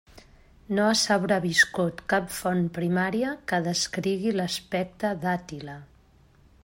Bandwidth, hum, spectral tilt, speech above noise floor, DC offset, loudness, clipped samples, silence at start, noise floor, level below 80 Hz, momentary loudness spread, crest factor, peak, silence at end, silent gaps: 16.5 kHz; none; -4 dB/octave; 32 dB; under 0.1%; -26 LUFS; under 0.1%; 0.7 s; -58 dBFS; -58 dBFS; 9 LU; 20 dB; -6 dBFS; 0.8 s; none